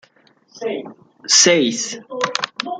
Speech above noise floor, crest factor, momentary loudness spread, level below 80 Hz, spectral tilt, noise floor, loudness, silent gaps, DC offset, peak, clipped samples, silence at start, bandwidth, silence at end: 38 dB; 20 dB; 18 LU; -68 dBFS; -1.5 dB/octave; -55 dBFS; -16 LUFS; none; under 0.1%; 0 dBFS; under 0.1%; 0.55 s; 11 kHz; 0 s